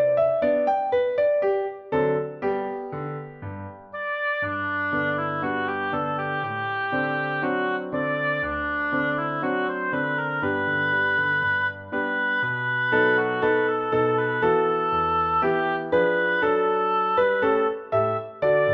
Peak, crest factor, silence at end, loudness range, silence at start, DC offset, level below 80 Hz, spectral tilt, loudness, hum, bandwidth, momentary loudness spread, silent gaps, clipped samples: -10 dBFS; 14 dB; 0 s; 5 LU; 0 s; under 0.1%; -56 dBFS; -8 dB/octave; -24 LUFS; none; 6 kHz; 6 LU; none; under 0.1%